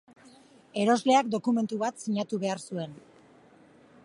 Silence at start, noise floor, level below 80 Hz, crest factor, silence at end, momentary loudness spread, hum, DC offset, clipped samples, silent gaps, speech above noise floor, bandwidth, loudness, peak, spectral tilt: 0.75 s; -57 dBFS; -78 dBFS; 20 dB; 1.05 s; 14 LU; none; under 0.1%; under 0.1%; none; 30 dB; 11.5 kHz; -28 LUFS; -10 dBFS; -5 dB/octave